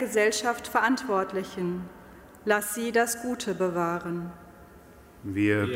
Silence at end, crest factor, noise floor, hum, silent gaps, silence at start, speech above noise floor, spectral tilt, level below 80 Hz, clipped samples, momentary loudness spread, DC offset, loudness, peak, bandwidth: 0 s; 20 dB; -51 dBFS; none; none; 0 s; 24 dB; -4.5 dB/octave; -60 dBFS; under 0.1%; 12 LU; under 0.1%; -27 LUFS; -10 dBFS; 16 kHz